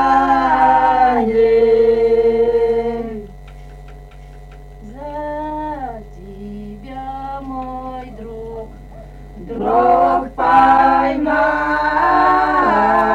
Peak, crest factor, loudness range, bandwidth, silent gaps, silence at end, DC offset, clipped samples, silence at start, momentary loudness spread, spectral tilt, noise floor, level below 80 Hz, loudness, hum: -2 dBFS; 14 dB; 16 LU; 7.8 kHz; none; 0 s; under 0.1%; under 0.1%; 0 s; 19 LU; -6.5 dB/octave; -36 dBFS; -36 dBFS; -14 LUFS; none